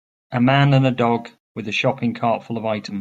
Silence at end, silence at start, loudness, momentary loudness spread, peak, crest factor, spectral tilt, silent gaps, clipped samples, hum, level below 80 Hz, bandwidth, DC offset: 0 s; 0.3 s; -19 LUFS; 11 LU; -2 dBFS; 18 dB; -7 dB/octave; 1.40-1.55 s; under 0.1%; none; -58 dBFS; 7.6 kHz; under 0.1%